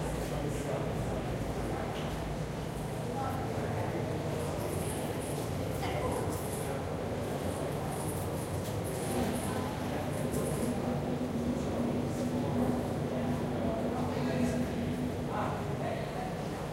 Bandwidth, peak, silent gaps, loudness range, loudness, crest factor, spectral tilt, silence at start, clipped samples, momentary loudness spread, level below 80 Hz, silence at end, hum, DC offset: 16 kHz; -18 dBFS; none; 3 LU; -34 LUFS; 14 dB; -6 dB/octave; 0 s; under 0.1%; 4 LU; -48 dBFS; 0 s; none; under 0.1%